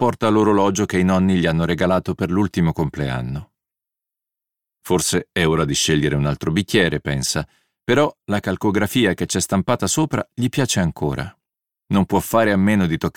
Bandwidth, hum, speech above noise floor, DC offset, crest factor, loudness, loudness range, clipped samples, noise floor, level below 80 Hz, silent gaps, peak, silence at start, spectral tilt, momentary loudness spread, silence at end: 17.5 kHz; none; 68 dB; under 0.1%; 16 dB; -19 LUFS; 4 LU; under 0.1%; -86 dBFS; -42 dBFS; none; -2 dBFS; 0 s; -5 dB/octave; 7 LU; 0.05 s